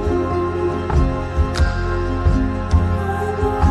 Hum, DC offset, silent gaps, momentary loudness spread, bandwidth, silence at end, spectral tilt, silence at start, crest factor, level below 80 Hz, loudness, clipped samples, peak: none; under 0.1%; none; 3 LU; 10.5 kHz; 0 s; -7.5 dB/octave; 0 s; 14 dB; -22 dBFS; -20 LUFS; under 0.1%; -4 dBFS